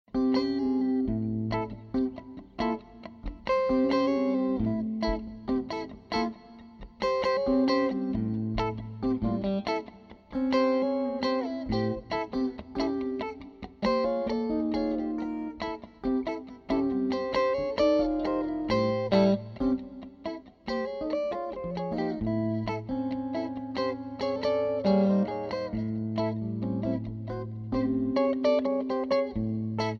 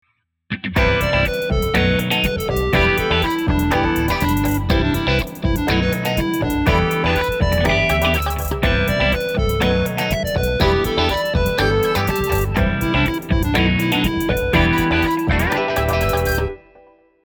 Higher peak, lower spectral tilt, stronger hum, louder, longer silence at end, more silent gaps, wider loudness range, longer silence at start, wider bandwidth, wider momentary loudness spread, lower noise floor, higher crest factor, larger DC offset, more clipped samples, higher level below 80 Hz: second, -10 dBFS vs -2 dBFS; first, -7.5 dB/octave vs -5.5 dB/octave; neither; second, -29 LUFS vs -18 LUFS; second, 0 s vs 0.7 s; neither; about the same, 3 LU vs 1 LU; second, 0.15 s vs 0.5 s; second, 7 kHz vs over 20 kHz; first, 11 LU vs 4 LU; about the same, -49 dBFS vs -50 dBFS; about the same, 18 dB vs 16 dB; neither; neither; second, -50 dBFS vs -26 dBFS